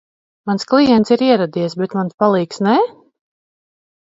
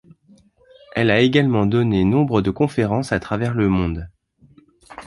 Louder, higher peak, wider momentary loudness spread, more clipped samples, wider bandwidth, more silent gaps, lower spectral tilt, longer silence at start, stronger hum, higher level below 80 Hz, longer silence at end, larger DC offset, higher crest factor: first, -16 LUFS vs -19 LUFS; about the same, 0 dBFS vs -2 dBFS; about the same, 10 LU vs 9 LU; neither; second, 7.8 kHz vs 11.5 kHz; first, 2.14-2.18 s vs none; about the same, -6.5 dB/octave vs -7.5 dB/octave; second, 0.45 s vs 0.95 s; neither; second, -58 dBFS vs -40 dBFS; first, 1.2 s vs 0 s; neither; about the same, 16 dB vs 18 dB